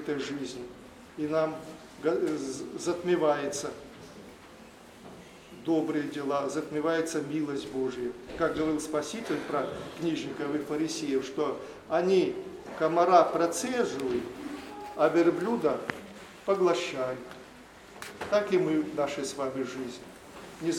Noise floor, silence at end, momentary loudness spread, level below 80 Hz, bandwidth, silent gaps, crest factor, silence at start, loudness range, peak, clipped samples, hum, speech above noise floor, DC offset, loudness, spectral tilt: -51 dBFS; 0 s; 21 LU; -64 dBFS; 16 kHz; none; 22 dB; 0 s; 5 LU; -8 dBFS; under 0.1%; none; 22 dB; under 0.1%; -30 LUFS; -5 dB/octave